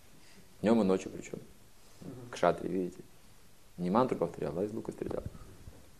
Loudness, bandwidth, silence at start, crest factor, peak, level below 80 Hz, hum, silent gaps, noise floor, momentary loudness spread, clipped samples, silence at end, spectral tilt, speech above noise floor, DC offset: -33 LUFS; 14 kHz; 0.35 s; 24 dB; -10 dBFS; -60 dBFS; none; none; -60 dBFS; 23 LU; under 0.1%; 0.2 s; -7 dB/octave; 28 dB; 0.2%